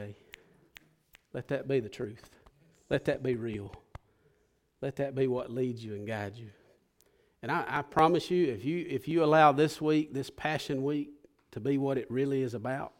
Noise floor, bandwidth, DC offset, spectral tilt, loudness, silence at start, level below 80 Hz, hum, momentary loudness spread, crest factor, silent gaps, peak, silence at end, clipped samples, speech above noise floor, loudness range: -72 dBFS; 16.5 kHz; under 0.1%; -6.5 dB/octave; -31 LUFS; 0 s; -64 dBFS; none; 16 LU; 22 dB; none; -10 dBFS; 0.1 s; under 0.1%; 42 dB; 9 LU